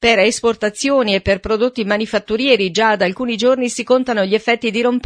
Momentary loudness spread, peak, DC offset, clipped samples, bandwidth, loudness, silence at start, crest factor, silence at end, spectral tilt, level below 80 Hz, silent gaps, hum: 5 LU; 0 dBFS; under 0.1%; under 0.1%; 10.5 kHz; -16 LUFS; 0 s; 16 dB; 0.05 s; -4 dB/octave; -44 dBFS; none; none